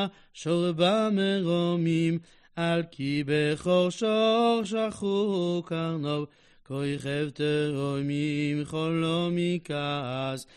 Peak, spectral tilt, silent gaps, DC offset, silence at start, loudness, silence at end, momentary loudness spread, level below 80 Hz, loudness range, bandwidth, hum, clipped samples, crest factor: -12 dBFS; -6.5 dB/octave; none; under 0.1%; 0 s; -27 LUFS; 0.15 s; 8 LU; -64 dBFS; 4 LU; 11.5 kHz; none; under 0.1%; 16 dB